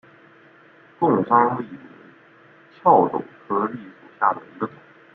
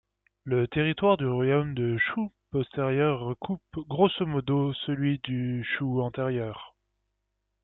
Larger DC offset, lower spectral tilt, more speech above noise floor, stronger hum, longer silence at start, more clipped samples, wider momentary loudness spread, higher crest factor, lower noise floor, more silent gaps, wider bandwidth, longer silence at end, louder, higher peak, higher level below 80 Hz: neither; about the same, -10.5 dB/octave vs -10.5 dB/octave; second, 31 dB vs 53 dB; second, none vs 50 Hz at -50 dBFS; first, 1 s vs 0.45 s; neither; first, 15 LU vs 10 LU; about the same, 22 dB vs 18 dB; second, -51 dBFS vs -80 dBFS; neither; about the same, 4.5 kHz vs 4.1 kHz; second, 0.45 s vs 0.95 s; first, -21 LUFS vs -28 LUFS; first, -2 dBFS vs -10 dBFS; second, -68 dBFS vs -58 dBFS